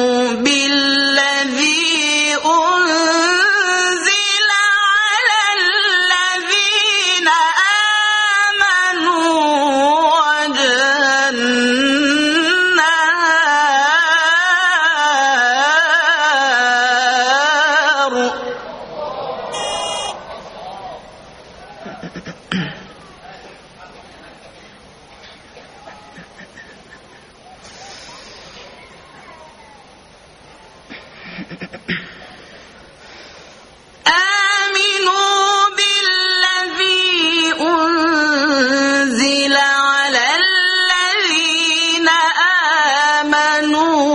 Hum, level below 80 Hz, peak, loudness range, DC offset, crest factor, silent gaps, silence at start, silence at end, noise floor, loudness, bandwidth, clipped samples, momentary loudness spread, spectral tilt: none; -58 dBFS; 0 dBFS; 18 LU; under 0.1%; 16 dB; none; 0 s; 0 s; -44 dBFS; -13 LUFS; 11 kHz; under 0.1%; 14 LU; -1 dB/octave